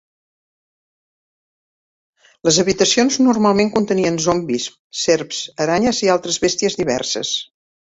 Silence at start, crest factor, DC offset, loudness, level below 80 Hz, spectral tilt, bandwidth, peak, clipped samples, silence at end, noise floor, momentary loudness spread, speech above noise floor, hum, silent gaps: 2.45 s; 18 dB; under 0.1%; -17 LUFS; -52 dBFS; -3.5 dB/octave; 8 kHz; 0 dBFS; under 0.1%; 0.5 s; under -90 dBFS; 8 LU; over 73 dB; none; 4.79-4.90 s